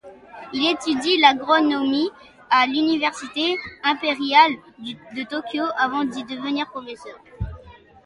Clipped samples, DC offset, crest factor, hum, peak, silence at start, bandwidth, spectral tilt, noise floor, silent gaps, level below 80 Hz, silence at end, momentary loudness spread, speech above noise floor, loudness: under 0.1%; under 0.1%; 22 dB; none; 0 dBFS; 0.05 s; 11.5 kHz; -4 dB/octave; -46 dBFS; none; -48 dBFS; 0.35 s; 18 LU; 25 dB; -20 LUFS